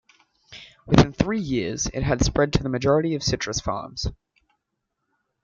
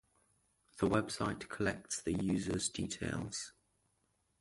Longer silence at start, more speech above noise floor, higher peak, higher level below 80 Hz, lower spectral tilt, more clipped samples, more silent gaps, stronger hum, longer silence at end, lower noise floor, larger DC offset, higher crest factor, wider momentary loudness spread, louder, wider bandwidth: second, 0.5 s vs 0.75 s; first, 57 dB vs 42 dB; first, 0 dBFS vs -16 dBFS; first, -38 dBFS vs -58 dBFS; about the same, -5 dB/octave vs -4.5 dB/octave; neither; neither; neither; first, 1.3 s vs 0.9 s; about the same, -79 dBFS vs -79 dBFS; neither; about the same, 24 dB vs 22 dB; first, 13 LU vs 7 LU; first, -23 LUFS vs -37 LUFS; second, 7.8 kHz vs 11.5 kHz